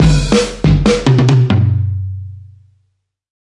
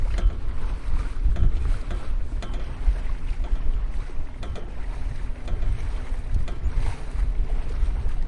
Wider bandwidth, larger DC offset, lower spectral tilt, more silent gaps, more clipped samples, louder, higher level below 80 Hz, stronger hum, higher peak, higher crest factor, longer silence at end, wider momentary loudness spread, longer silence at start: first, 11.5 kHz vs 8.8 kHz; neither; about the same, -6.5 dB/octave vs -7 dB/octave; neither; neither; first, -12 LUFS vs -31 LUFS; about the same, -24 dBFS vs -24 dBFS; neither; first, 0 dBFS vs -8 dBFS; about the same, 12 dB vs 16 dB; first, 0.95 s vs 0 s; first, 14 LU vs 8 LU; about the same, 0 s vs 0 s